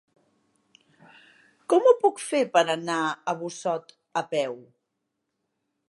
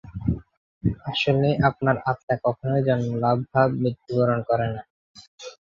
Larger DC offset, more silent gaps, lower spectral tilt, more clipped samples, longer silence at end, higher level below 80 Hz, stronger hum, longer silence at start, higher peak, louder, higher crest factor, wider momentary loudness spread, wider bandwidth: neither; second, none vs 0.57-0.81 s, 2.23-2.28 s, 4.90-5.15 s, 5.27-5.38 s; second, -4 dB/octave vs -7.5 dB/octave; neither; first, 1.3 s vs 0.15 s; second, -84 dBFS vs -46 dBFS; neither; first, 1.7 s vs 0.05 s; about the same, -6 dBFS vs -6 dBFS; about the same, -25 LUFS vs -24 LUFS; about the same, 22 dB vs 18 dB; first, 13 LU vs 8 LU; first, 11.5 kHz vs 7.4 kHz